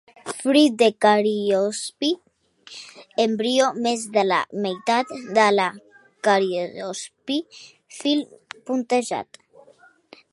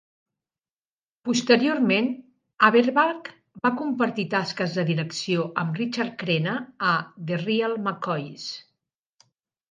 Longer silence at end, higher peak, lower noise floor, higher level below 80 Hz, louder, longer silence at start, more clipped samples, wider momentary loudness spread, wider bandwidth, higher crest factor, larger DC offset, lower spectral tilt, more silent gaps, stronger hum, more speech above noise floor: about the same, 1.1 s vs 1.1 s; about the same, -2 dBFS vs -2 dBFS; second, -54 dBFS vs under -90 dBFS; about the same, -76 dBFS vs -74 dBFS; about the same, -22 LUFS vs -24 LUFS; second, 0.25 s vs 1.25 s; neither; first, 18 LU vs 13 LU; first, 11.5 kHz vs 9.6 kHz; about the same, 20 dB vs 24 dB; neither; second, -3.5 dB/octave vs -5.5 dB/octave; neither; neither; second, 32 dB vs over 66 dB